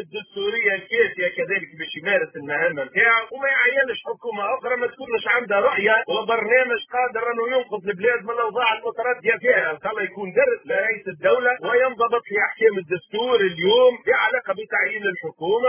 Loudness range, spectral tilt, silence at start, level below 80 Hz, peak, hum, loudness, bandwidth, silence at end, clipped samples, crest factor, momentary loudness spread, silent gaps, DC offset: 2 LU; -7 dB/octave; 0 s; -66 dBFS; -4 dBFS; none; -21 LUFS; 3.5 kHz; 0 s; under 0.1%; 16 dB; 8 LU; none; under 0.1%